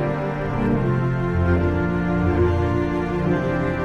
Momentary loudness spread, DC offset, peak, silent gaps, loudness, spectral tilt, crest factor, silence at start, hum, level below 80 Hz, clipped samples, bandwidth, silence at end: 4 LU; under 0.1%; -8 dBFS; none; -21 LUFS; -9 dB/octave; 12 dB; 0 s; none; -32 dBFS; under 0.1%; 7 kHz; 0 s